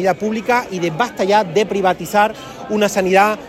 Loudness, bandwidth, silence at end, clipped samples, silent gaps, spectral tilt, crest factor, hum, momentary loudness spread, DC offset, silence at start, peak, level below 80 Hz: -17 LUFS; 16.5 kHz; 0 s; under 0.1%; none; -4.5 dB/octave; 16 dB; none; 6 LU; under 0.1%; 0 s; 0 dBFS; -52 dBFS